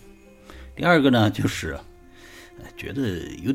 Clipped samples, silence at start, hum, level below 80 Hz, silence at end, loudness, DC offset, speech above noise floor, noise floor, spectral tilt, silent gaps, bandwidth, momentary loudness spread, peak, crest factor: under 0.1%; 0.05 s; none; -46 dBFS; 0 s; -22 LUFS; under 0.1%; 26 dB; -48 dBFS; -6 dB/octave; none; 16.5 kHz; 25 LU; -4 dBFS; 20 dB